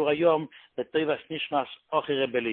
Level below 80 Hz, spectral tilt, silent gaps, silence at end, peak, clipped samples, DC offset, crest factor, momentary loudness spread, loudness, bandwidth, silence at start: -70 dBFS; -9.5 dB/octave; none; 0 s; -10 dBFS; under 0.1%; under 0.1%; 18 dB; 7 LU; -28 LUFS; 4.3 kHz; 0 s